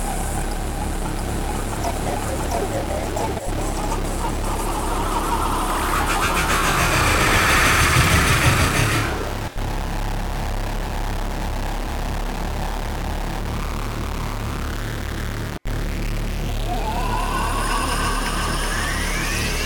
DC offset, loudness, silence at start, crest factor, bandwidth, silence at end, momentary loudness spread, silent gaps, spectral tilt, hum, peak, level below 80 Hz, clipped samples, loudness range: under 0.1%; -22 LUFS; 0 s; 16 dB; 19 kHz; 0 s; 12 LU; none; -4 dB/octave; none; -4 dBFS; -26 dBFS; under 0.1%; 10 LU